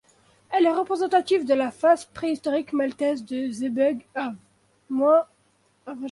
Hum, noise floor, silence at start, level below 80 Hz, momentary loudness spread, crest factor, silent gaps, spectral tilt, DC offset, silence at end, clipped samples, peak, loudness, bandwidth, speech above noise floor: none; -65 dBFS; 0.5 s; -68 dBFS; 11 LU; 16 dB; none; -5 dB/octave; under 0.1%; 0 s; under 0.1%; -8 dBFS; -24 LUFS; 11.5 kHz; 42 dB